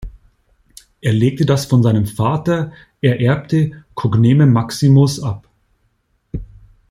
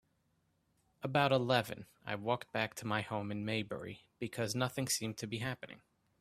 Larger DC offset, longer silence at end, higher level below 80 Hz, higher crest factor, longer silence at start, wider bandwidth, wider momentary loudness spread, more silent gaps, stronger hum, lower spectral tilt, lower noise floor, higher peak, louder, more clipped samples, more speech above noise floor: neither; about the same, 0.45 s vs 0.45 s; first, -42 dBFS vs -72 dBFS; second, 14 dB vs 24 dB; second, 0 s vs 1 s; about the same, 15 kHz vs 15.5 kHz; about the same, 16 LU vs 14 LU; neither; neither; first, -7 dB/octave vs -4.5 dB/octave; second, -63 dBFS vs -77 dBFS; first, -2 dBFS vs -14 dBFS; first, -15 LUFS vs -37 LUFS; neither; first, 49 dB vs 41 dB